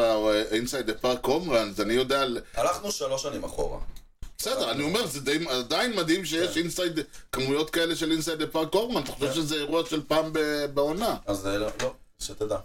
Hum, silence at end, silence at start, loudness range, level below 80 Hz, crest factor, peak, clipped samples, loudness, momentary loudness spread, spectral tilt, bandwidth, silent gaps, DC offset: none; 0 s; 0 s; 2 LU; -46 dBFS; 16 dB; -12 dBFS; under 0.1%; -27 LUFS; 8 LU; -3.5 dB/octave; 16.5 kHz; none; under 0.1%